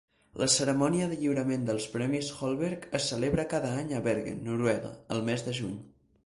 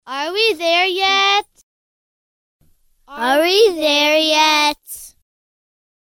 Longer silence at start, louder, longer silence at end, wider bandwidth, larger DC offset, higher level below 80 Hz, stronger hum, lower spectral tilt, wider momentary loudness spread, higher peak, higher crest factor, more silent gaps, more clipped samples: first, 0.35 s vs 0.05 s; second, -30 LUFS vs -14 LUFS; second, 0.35 s vs 0.95 s; second, 11.5 kHz vs 18 kHz; neither; about the same, -58 dBFS vs -60 dBFS; neither; first, -4.5 dB/octave vs 0 dB/octave; about the same, 8 LU vs 10 LU; second, -12 dBFS vs -2 dBFS; about the same, 20 dB vs 16 dB; second, none vs 1.63-2.59 s; neither